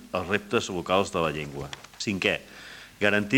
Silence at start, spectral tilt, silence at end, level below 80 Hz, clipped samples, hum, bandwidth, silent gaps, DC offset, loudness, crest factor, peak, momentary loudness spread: 0 s; -4.5 dB/octave; 0 s; -56 dBFS; under 0.1%; none; 17 kHz; none; under 0.1%; -27 LUFS; 22 dB; -6 dBFS; 15 LU